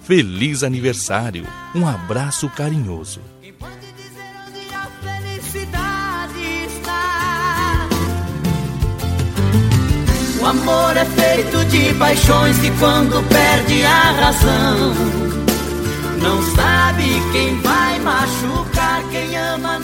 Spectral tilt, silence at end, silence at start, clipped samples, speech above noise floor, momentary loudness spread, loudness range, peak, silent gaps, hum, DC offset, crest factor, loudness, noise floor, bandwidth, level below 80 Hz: -4.5 dB/octave; 0 s; 0 s; under 0.1%; 22 dB; 14 LU; 12 LU; 0 dBFS; none; none; under 0.1%; 16 dB; -16 LUFS; -37 dBFS; 16.5 kHz; -28 dBFS